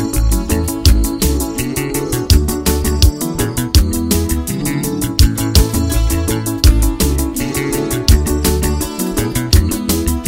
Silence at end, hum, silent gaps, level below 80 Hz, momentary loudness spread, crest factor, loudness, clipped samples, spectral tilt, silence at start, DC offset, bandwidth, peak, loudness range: 0 s; none; none; -16 dBFS; 5 LU; 14 dB; -15 LUFS; under 0.1%; -5 dB/octave; 0 s; under 0.1%; 16.5 kHz; 0 dBFS; 1 LU